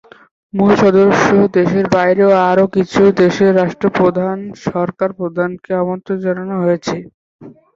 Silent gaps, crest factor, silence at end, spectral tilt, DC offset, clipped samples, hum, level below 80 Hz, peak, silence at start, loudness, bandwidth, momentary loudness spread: 7.14-7.39 s; 14 dB; 0.25 s; -7 dB/octave; under 0.1%; under 0.1%; none; -50 dBFS; 0 dBFS; 0.55 s; -14 LUFS; 7.6 kHz; 9 LU